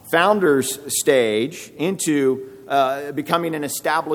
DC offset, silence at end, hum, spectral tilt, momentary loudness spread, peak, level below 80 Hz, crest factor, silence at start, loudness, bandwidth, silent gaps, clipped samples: under 0.1%; 0 s; none; -3.5 dB/octave; 8 LU; -2 dBFS; -66 dBFS; 18 dB; 0.05 s; -20 LUFS; 19.5 kHz; none; under 0.1%